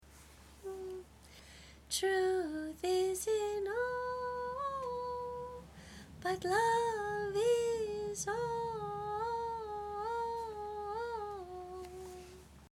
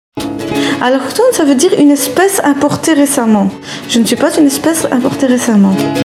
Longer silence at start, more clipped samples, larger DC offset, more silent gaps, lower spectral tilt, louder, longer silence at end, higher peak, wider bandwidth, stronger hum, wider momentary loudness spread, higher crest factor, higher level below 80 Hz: second, 0 s vs 0.15 s; neither; neither; neither; about the same, -3.5 dB/octave vs -4.5 dB/octave; second, -37 LUFS vs -10 LUFS; about the same, 0.05 s vs 0 s; second, -20 dBFS vs 0 dBFS; about the same, 16.5 kHz vs 16 kHz; neither; first, 20 LU vs 6 LU; first, 18 dB vs 10 dB; second, -60 dBFS vs -50 dBFS